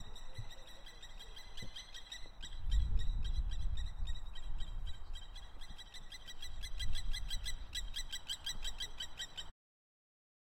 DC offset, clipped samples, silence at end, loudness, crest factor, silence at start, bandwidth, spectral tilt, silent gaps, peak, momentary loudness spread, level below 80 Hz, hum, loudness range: under 0.1%; under 0.1%; 1 s; -45 LUFS; 18 dB; 0 s; 14.5 kHz; -2.5 dB/octave; none; -20 dBFS; 12 LU; -42 dBFS; none; 5 LU